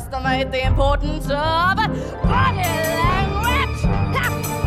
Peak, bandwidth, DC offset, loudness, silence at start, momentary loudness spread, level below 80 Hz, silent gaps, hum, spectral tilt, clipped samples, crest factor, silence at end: -4 dBFS; 16 kHz; under 0.1%; -19 LUFS; 0 s; 4 LU; -26 dBFS; none; none; -5.5 dB/octave; under 0.1%; 16 dB; 0 s